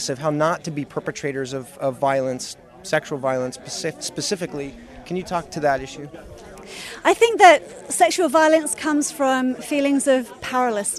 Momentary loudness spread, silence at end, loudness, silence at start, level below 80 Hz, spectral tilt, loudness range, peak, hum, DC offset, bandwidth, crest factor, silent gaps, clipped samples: 18 LU; 0 s; -20 LUFS; 0 s; -54 dBFS; -3.5 dB/octave; 9 LU; 0 dBFS; none; under 0.1%; 14.5 kHz; 20 dB; none; under 0.1%